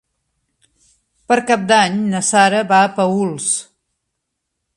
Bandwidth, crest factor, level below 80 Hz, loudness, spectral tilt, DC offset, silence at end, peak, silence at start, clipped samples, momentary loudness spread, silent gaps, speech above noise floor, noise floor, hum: 11.5 kHz; 18 dB; -62 dBFS; -15 LUFS; -3.5 dB/octave; under 0.1%; 1.15 s; 0 dBFS; 1.3 s; under 0.1%; 6 LU; none; 61 dB; -76 dBFS; none